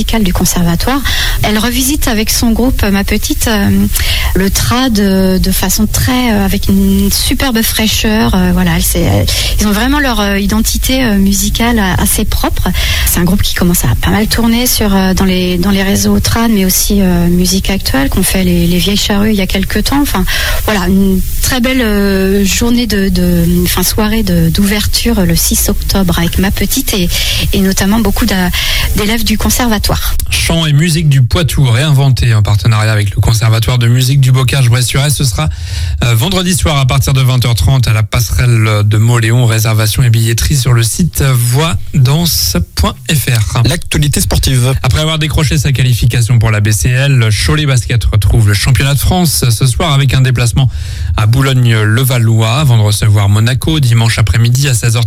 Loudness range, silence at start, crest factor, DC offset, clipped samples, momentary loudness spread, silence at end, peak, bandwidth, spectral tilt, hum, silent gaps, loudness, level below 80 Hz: 1 LU; 0 s; 10 dB; under 0.1%; under 0.1%; 3 LU; 0 s; 0 dBFS; 18 kHz; -4.5 dB/octave; none; none; -10 LUFS; -18 dBFS